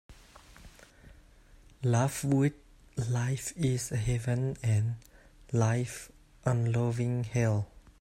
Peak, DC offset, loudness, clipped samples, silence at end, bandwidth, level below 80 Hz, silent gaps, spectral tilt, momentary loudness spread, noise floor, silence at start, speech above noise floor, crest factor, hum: -14 dBFS; under 0.1%; -31 LUFS; under 0.1%; 0.1 s; 14.5 kHz; -54 dBFS; none; -6.5 dB/octave; 9 LU; -57 dBFS; 0.1 s; 28 dB; 16 dB; none